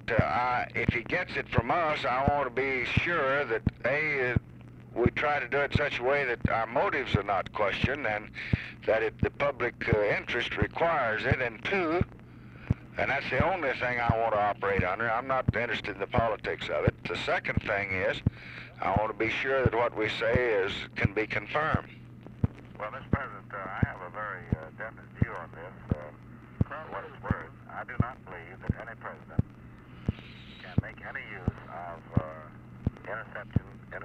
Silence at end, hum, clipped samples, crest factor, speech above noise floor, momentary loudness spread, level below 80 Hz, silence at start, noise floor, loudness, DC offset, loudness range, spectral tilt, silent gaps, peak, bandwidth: 0 s; none; under 0.1%; 22 dB; 20 dB; 14 LU; -46 dBFS; 0 s; -49 dBFS; -30 LUFS; under 0.1%; 8 LU; -7 dB/octave; none; -8 dBFS; 8.8 kHz